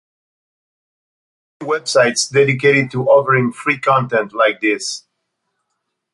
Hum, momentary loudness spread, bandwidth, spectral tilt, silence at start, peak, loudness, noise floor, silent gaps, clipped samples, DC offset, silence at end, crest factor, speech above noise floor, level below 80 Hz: none; 9 LU; 11.5 kHz; -4 dB/octave; 1.6 s; -2 dBFS; -15 LUFS; -74 dBFS; none; under 0.1%; under 0.1%; 1.15 s; 16 dB; 59 dB; -62 dBFS